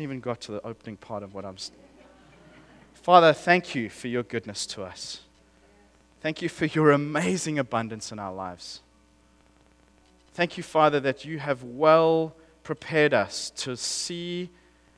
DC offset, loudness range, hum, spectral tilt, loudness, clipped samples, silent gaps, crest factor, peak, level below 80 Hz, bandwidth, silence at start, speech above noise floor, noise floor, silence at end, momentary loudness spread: under 0.1%; 8 LU; none; -4.5 dB/octave; -25 LUFS; under 0.1%; none; 26 dB; -2 dBFS; -64 dBFS; 11 kHz; 0 s; 35 dB; -60 dBFS; 0.5 s; 18 LU